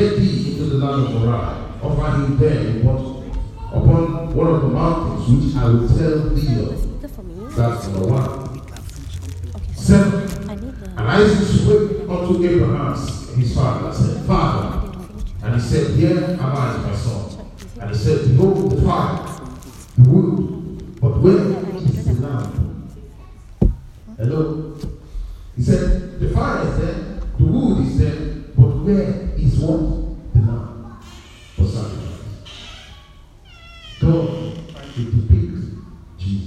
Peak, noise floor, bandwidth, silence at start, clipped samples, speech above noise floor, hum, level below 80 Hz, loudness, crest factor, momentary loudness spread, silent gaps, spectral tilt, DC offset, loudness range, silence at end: 0 dBFS; -43 dBFS; 11.5 kHz; 0 s; under 0.1%; 27 dB; none; -28 dBFS; -18 LUFS; 18 dB; 18 LU; none; -8 dB/octave; under 0.1%; 7 LU; 0 s